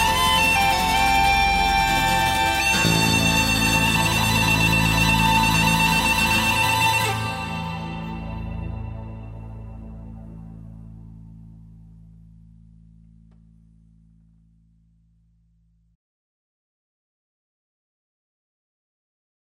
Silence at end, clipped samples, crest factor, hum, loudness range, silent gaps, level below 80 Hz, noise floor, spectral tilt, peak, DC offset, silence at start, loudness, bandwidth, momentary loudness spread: 8 s; under 0.1%; 18 dB; none; 20 LU; none; -36 dBFS; -61 dBFS; -3 dB/octave; -6 dBFS; under 0.1%; 0 s; -18 LUFS; 16.5 kHz; 21 LU